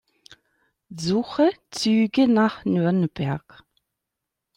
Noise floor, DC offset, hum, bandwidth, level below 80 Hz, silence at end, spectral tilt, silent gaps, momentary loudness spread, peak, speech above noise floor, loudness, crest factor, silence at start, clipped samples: -84 dBFS; under 0.1%; none; 11.5 kHz; -60 dBFS; 1.2 s; -6 dB/octave; none; 10 LU; -8 dBFS; 62 dB; -22 LUFS; 16 dB; 0.9 s; under 0.1%